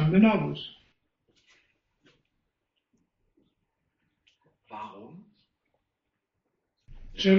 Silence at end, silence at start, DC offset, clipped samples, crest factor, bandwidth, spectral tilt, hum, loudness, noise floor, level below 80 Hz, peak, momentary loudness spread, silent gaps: 0 s; 0 s; under 0.1%; under 0.1%; 22 dB; 6.6 kHz; -5.5 dB/octave; none; -25 LUFS; -83 dBFS; -56 dBFS; -8 dBFS; 26 LU; none